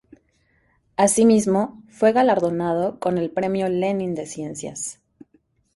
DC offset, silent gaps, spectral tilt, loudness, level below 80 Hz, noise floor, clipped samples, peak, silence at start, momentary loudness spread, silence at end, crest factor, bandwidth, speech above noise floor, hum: under 0.1%; none; -5 dB/octave; -21 LUFS; -60 dBFS; -64 dBFS; under 0.1%; -4 dBFS; 1 s; 15 LU; 0.85 s; 18 dB; 11.5 kHz; 44 dB; none